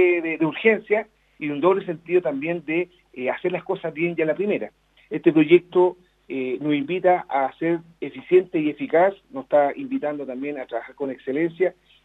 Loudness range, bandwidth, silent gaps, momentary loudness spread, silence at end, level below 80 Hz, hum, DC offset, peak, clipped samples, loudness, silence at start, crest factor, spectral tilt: 3 LU; 4 kHz; none; 12 LU; 0.35 s; -68 dBFS; none; under 0.1%; -2 dBFS; under 0.1%; -23 LUFS; 0 s; 20 dB; -8.5 dB/octave